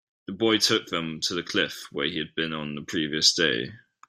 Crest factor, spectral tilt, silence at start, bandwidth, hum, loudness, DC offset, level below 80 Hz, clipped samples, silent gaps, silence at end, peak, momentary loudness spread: 22 dB; -2.5 dB/octave; 0.3 s; 16 kHz; none; -25 LUFS; under 0.1%; -64 dBFS; under 0.1%; none; 0.3 s; -4 dBFS; 10 LU